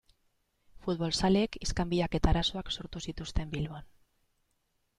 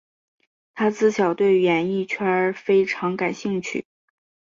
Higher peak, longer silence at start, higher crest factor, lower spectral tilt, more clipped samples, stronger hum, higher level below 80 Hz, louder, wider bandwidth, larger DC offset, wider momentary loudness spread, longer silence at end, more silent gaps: second, -14 dBFS vs -8 dBFS; about the same, 0.75 s vs 0.75 s; first, 20 dB vs 14 dB; about the same, -5.5 dB/octave vs -6 dB/octave; neither; neither; first, -40 dBFS vs -68 dBFS; second, -32 LUFS vs -21 LUFS; first, 11.5 kHz vs 7.6 kHz; neither; first, 12 LU vs 8 LU; first, 1.15 s vs 0.7 s; neither